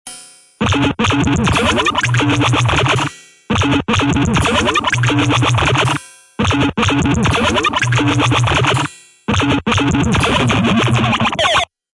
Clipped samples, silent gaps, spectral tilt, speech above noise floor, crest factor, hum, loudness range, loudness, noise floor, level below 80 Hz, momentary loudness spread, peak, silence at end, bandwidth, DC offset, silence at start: under 0.1%; none; -5 dB/octave; 24 dB; 12 dB; none; 0 LU; -14 LUFS; -38 dBFS; -34 dBFS; 5 LU; -2 dBFS; 0.3 s; 11.5 kHz; under 0.1%; 0.05 s